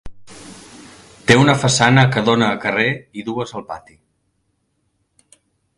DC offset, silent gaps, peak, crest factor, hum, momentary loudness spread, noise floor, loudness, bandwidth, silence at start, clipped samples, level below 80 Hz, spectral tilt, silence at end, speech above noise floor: under 0.1%; none; 0 dBFS; 20 dB; none; 25 LU; -68 dBFS; -16 LUFS; 11.5 kHz; 0.05 s; under 0.1%; -48 dBFS; -4.5 dB/octave; 2 s; 52 dB